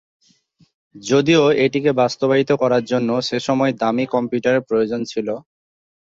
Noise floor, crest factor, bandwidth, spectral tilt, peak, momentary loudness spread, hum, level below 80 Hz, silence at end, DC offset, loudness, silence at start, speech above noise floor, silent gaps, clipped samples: -57 dBFS; 16 dB; 7.8 kHz; -5.5 dB/octave; -2 dBFS; 9 LU; none; -60 dBFS; 0.65 s; under 0.1%; -18 LUFS; 0.95 s; 40 dB; none; under 0.1%